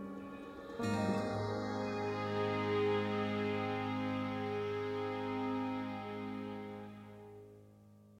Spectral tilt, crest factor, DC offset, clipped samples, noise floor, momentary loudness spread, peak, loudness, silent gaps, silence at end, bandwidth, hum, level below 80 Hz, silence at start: -6.5 dB/octave; 14 dB; under 0.1%; under 0.1%; -60 dBFS; 14 LU; -24 dBFS; -38 LUFS; none; 0 s; 14 kHz; none; -68 dBFS; 0 s